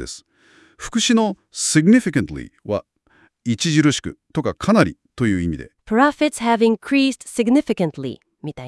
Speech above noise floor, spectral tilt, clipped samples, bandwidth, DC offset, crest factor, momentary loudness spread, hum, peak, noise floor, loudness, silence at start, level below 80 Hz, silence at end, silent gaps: 39 dB; -4.5 dB/octave; under 0.1%; 12 kHz; under 0.1%; 20 dB; 15 LU; none; 0 dBFS; -57 dBFS; -19 LUFS; 0 s; -48 dBFS; 0 s; none